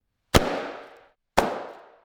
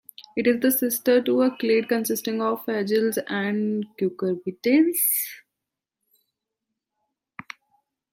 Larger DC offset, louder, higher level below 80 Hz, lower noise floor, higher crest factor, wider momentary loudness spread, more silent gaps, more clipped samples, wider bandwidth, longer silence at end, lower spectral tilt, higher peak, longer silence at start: neither; second, -26 LUFS vs -23 LUFS; first, -38 dBFS vs -74 dBFS; second, -54 dBFS vs -86 dBFS; first, 22 dB vs 16 dB; first, 18 LU vs 10 LU; neither; neither; first, 19 kHz vs 16.5 kHz; second, 0.35 s vs 2.75 s; about the same, -4.5 dB/octave vs -4 dB/octave; about the same, -6 dBFS vs -8 dBFS; first, 0.35 s vs 0.2 s